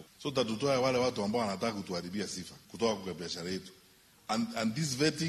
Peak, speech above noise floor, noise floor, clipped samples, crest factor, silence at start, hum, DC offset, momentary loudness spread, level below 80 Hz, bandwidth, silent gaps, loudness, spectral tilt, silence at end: -16 dBFS; 29 dB; -62 dBFS; under 0.1%; 18 dB; 0 s; none; under 0.1%; 11 LU; -66 dBFS; 13 kHz; none; -33 LUFS; -4.5 dB/octave; 0 s